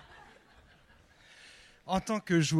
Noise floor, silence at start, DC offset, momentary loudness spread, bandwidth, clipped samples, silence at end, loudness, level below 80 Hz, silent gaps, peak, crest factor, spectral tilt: -61 dBFS; 1.85 s; under 0.1%; 27 LU; 13.5 kHz; under 0.1%; 0 s; -32 LUFS; -60 dBFS; none; -16 dBFS; 18 dB; -5 dB/octave